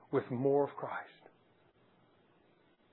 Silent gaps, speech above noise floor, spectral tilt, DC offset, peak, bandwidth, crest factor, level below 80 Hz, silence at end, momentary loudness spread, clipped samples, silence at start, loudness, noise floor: none; 35 dB; -7.5 dB/octave; under 0.1%; -20 dBFS; 4 kHz; 18 dB; -88 dBFS; 1.85 s; 13 LU; under 0.1%; 0.1 s; -35 LUFS; -69 dBFS